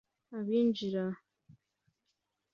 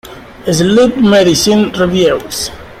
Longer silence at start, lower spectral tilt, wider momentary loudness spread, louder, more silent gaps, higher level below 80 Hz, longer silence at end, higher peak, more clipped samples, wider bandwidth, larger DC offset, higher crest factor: first, 0.3 s vs 0.05 s; first, -7.5 dB/octave vs -4.5 dB/octave; first, 16 LU vs 11 LU; second, -33 LUFS vs -10 LUFS; neither; second, -78 dBFS vs -38 dBFS; first, 1 s vs 0 s; second, -20 dBFS vs 0 dBFS; neither; second, 6.8 kHz vs 15.5 kHz; neither; first, 16 dB vs 10 dB